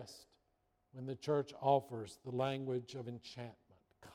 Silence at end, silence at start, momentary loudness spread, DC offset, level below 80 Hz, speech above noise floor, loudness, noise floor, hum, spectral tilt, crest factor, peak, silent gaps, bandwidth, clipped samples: 0 s; 0 s; 18 LU; under 0.1%; -78 dBFS; 41 dB; -40 LUFS; -80 dBFS; none; -6.5 dB/octave; 22 dB; -20 dBFS; none; 16 kHz; under 0.1%